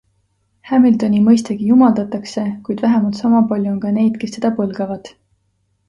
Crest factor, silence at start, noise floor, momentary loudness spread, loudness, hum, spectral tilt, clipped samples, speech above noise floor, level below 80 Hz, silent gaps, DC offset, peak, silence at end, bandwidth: 14 dB; 0.65 s; -64 dBFS; 11 LU; -16 LUFS; none; -7 dB/octave; under 0.1%; 50 dB; -56 dBFS; none; under 0.1%; -2 dBFS; 0.8 s; 10.5 kHz